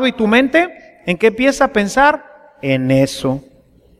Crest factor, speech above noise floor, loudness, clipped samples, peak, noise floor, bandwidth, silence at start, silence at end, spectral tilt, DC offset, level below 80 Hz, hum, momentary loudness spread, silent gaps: 16 dB; 35 dB; -15 LUFS; under 0.1%; 0 dBFS; -49 dBFS; 14.5 kHz; 0 s; 0.6 s; -5.5 dB/octave; under 0.1%; -44 dBFS; none; 12 LU; none